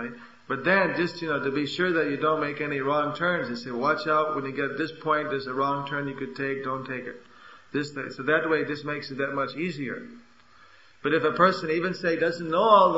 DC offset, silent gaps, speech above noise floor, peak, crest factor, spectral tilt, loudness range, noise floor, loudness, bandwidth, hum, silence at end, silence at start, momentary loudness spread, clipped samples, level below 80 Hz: 0.1%; none; 30 dB; -6 dBFS; 20 dB; -6 dB/octave; 4 LU; -56 dBFS; -26 LUFS; 8 kHz; none; 0 s; 0 s; 11 LU; under 0.1%; -68 dBFS